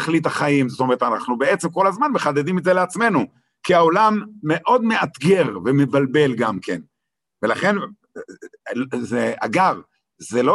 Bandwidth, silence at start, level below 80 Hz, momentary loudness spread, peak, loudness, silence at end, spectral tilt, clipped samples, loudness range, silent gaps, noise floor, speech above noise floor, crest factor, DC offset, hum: 12.5 kHz; 0 s; -62 dBFS; 13 LU; -2 dBFS; -19 LUFS; 0 s; -6 dB/octave; under 0.1%; 5 LU; none; -82 dBFS; 63 dB; 16 dB; under 0.1%; none